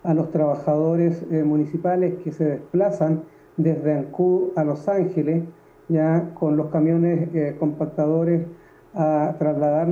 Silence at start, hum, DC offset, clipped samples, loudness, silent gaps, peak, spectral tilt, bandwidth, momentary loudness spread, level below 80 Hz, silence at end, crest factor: 0.05 s; none; under 0.1%; under 0.1%; -22 LUFS; none; -8 dBFS; -11 dB/octave; 6.8 kHz; 5 LU; -62 dBFS; 0 s; 14 dB